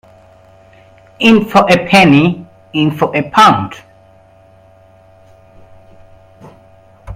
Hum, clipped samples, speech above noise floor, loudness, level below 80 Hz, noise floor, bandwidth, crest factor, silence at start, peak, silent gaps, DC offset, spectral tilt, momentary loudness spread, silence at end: none; 0.1%; 35 dB; -10 LUFS; -46 dBFS; -45 dBFS; 16 kHz; 14 dB; 1.2 s; 0 dBFS; none; under 0.1%; -5.5 dB/octave; 11 LU; 0 s